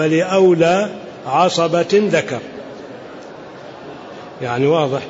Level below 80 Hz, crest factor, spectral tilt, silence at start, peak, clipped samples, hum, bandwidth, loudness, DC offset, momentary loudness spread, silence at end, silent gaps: -60 dBFS; 14 dB; -5.5 dB/octave; 0 s; -4 dBFS; under 0.1%; none; 8 kHz; -16 LUFS; under 0.1%; 21 LU; 0 s; none